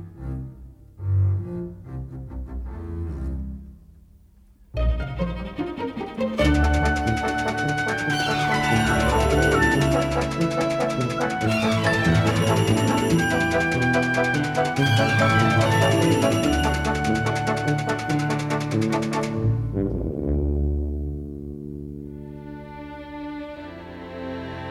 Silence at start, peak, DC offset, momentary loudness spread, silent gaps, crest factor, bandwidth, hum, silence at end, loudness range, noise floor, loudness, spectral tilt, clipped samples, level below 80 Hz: 0 s; -6 dBFS; under 0.1%; 17 LU; none; 16 dB; 14.5 kHz; none; 0 s; 12 LU; -52 dBFS; -22 LUFS; -5.5 dB/octave; under 0.1%; -32 dBFS